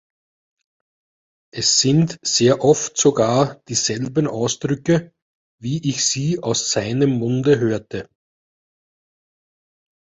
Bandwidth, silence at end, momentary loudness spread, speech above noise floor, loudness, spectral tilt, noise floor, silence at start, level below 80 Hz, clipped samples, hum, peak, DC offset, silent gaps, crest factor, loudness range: 8.2 kHz; 2.05 s; 8 LU; over 71 dB; -18 LUFS; -4 dB/octave; under -90 dBFS; 1.55 s; -56 dBFS; under 0.1%; none; -2 dBFS; under 0.1%; 5.22-5.58 s; 20 dB; 4 LU